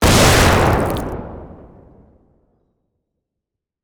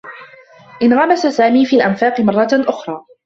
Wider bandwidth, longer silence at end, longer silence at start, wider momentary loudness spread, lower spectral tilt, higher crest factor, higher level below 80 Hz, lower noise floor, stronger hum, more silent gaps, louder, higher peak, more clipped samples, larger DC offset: first, over 20 kHz vs 7.6 kHz; first, 2.35 s vs 0.25 s; about the same, 0 s vs 0.05 s; first, 23 LU vs 11 LU; second, -4 dB/octave vs -6 dB/octave; about the same, 18 dB vs 14 dB; first, -28 dBFS vs -58 dBFS; first, -82 dBFS vs -42 dBFS; neither; neither; about the same, -13 LUFS vs -13 LUFS; about the same, 0 dBFS vs 0 dBFS; neither; neither